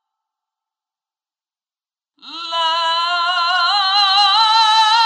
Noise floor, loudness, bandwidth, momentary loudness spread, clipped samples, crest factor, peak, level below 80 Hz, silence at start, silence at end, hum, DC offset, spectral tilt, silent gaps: under -90 dBFS; -13 LUFS; 11.5 kHz; 9 LU; under 0.1%; 14 dB; -4 dBFS; under -90 dBFS; 2.25 s; 0 s; none; under 0.1%; 4.5 dB/octave; none